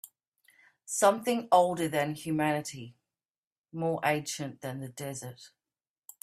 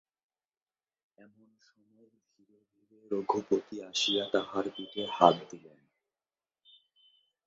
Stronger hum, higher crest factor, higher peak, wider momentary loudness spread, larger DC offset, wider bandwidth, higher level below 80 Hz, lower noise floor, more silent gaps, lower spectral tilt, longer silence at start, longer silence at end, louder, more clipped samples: neither; second, 22 dB vs 30 dB; second, -10 dBFS vs -6 dBFS; first, 17 LU vs 13 LU; neither; first, 15.5 kHz vs 7.4 kHz; about the same, -74 dBFS vs -76 dBFS; about the same, under -90 dBFS vs under -90 dBFS; first, 0.28-0.32 s, 3.25-3.51 s, 3.58-3.64 s vs none; first, -4.5 dB/octave vs -2.5 dB/octave; second, 0.05 s vs 3.1 s; second, 0.75 s vs 1.9 s; about the same, -30 LUFS vs -30 LUFS; neither